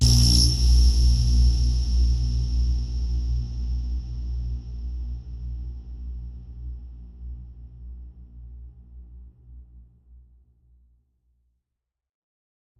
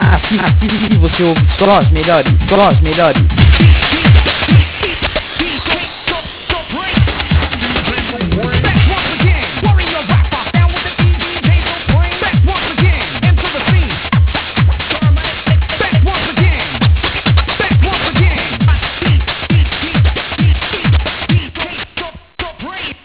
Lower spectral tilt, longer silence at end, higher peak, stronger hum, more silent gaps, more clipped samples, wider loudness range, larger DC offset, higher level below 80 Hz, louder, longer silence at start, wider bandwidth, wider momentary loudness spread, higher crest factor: second, -4.5 dB/octave vs -10 dB/octave; first, 3 s vs 0.1 s; second, -6 dBFS vs 0 dBFS; neither; neither; second, under 0.1% vs 0.1%; first, 24 LU vs 5 LU; second, under 0.1% vs 0.2%; second, -26 dBFS vs -16 dBFS; second, -24 LUFS vs -12 LUFS; about the same, 0 s vs 0 s; first, 12.5 kHz vs 4 kHz; first, 25 LU vs 7 LU; first, 18 dB vs 12 dB